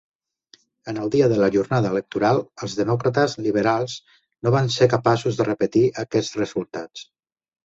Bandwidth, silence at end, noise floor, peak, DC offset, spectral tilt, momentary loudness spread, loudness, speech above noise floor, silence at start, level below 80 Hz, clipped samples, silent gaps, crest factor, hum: 8 kHz; 0.6 s; -57 dBFS; -2 dBFS; under 0.1%; -6 dB/octave; 14 LU; -21 LUFS; 36 dB; 0.85 s; -56 dBFS; under 0.1%; none; 18 dB; none